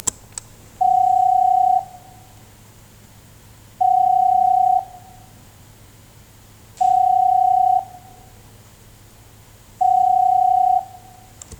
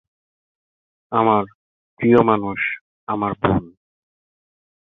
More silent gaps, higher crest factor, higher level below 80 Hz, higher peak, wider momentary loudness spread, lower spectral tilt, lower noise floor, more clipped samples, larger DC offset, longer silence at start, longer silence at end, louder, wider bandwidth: second, none vs 1.55-1.97 s, 2.81-3.07 s; about the same, 18 dB vs 20 dB; about the same, -52 dBFS vs -48 dBFS; about the same, -2 dBFS vs -2 dBFS; first, 19 LU vs 11 LU; second, -3.5 dB/octave vs -9.5 dB/octave; second, -46 dBFS vs under -90 dBFS; neither; neither; second, 0.05 s vs 1.1 s; second, 0.05 s vs 1.2 s; about the same, -17 LUFS vs -19 LUFS; first, 19.5 kHz vs 4 kHz